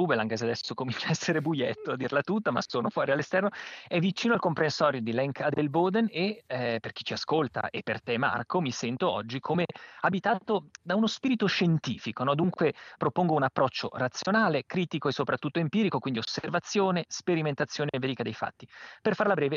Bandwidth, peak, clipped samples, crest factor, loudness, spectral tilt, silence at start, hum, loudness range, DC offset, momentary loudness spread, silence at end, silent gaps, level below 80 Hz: 7.6 kHz; -10 dBFS; under 0.1%; 20 dB; -29 LUFS; -5.5 dB/octave; 0 s; none; 2 LU; under 0.1%; 7 LU; 0 s; none; -72 dBFS